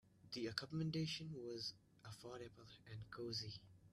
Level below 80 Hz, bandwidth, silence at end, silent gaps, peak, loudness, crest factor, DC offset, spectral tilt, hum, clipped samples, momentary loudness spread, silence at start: -76 dBFS; 13 kHz; 0.05 s; none; -24 dBFS; -48 LUFS; 26 dB; under 0.1%; -5 dB/octave; none; under 0.1%; 14 LU; 0.05 s